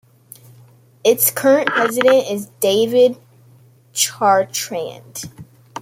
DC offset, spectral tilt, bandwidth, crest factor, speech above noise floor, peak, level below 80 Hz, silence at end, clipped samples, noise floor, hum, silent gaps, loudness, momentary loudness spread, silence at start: under 0.1%; -2.5 dB/octave; 16.5 kHz; 18 dB; 33 dB; 0 dBFS; -64 dBFS; 0 s; under 0.1%; -49 dBFS; none; none; -16 LUFS; 17 LU; 1.05 s